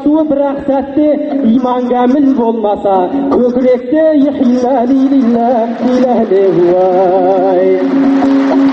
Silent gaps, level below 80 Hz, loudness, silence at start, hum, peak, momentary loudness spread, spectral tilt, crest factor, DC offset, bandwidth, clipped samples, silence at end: none; -46 dBFS; -10 LUFS; 0 s; none; 0 dBFS; 3 LU; -8 dB/octave; 10 dB; under 0.1%; 6.4 kHz; under 0.1%; 0 s